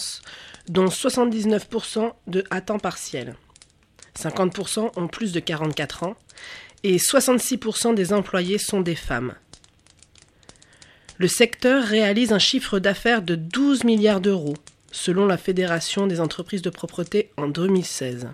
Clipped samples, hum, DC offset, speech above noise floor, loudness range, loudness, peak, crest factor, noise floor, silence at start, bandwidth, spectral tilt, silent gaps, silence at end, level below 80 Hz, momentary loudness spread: under 0.1%; none; under 0.1%; 33 dB; 8 LU; -22 LUFS; -4 dBFS; 18 dB; -55 dBFS; 0 s; 15.5 kHz; -4 dB/octave; none; 0 s; -52 dBFS; 13 LU